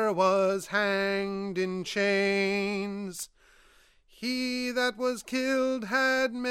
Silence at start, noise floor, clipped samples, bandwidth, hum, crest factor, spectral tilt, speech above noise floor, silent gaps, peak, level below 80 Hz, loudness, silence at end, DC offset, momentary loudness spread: 0 s; -61 dBFS; under 0.1%; 16 kHz; none; 16 dB; -4 dB/octave; 32 dB; none; -12 dBFS; -64 dBFS; -28 LUFS; 0 s; under 0.1%; 9 LU